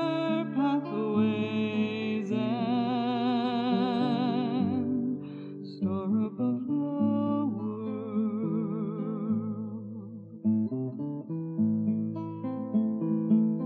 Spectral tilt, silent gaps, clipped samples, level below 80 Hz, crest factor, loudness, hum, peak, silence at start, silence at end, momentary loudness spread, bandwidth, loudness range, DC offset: -9 dB/octave; none; under 0.1%; -82 dBFS; 14 dB; -30 LUFS; none; -14 dBFS; 0 s; 0 s; 8 LU; 4.6 kHz; 4 LU; under 0.1%